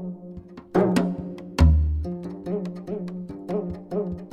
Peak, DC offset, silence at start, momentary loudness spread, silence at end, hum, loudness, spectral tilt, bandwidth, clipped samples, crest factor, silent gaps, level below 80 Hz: -4 dBFS; under 0.1%; 0 s; 16 LU; 0 s; none; -26 LUFS; -8 dB/octave; 11 kHz; under 0.1%; 20 dB; none; -28 dBFS